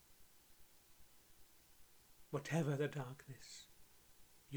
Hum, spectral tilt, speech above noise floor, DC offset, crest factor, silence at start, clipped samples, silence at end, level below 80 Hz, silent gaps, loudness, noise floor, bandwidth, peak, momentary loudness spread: none; -6 dB/octave; 23 dB; under 0.1%; 22 dB; 0.1 s; under 0.1%; 0 s; -76 dBFS; none; -44 LUFS; -65 dBFS; over 20 kHz; -26 dBFS; 26 LU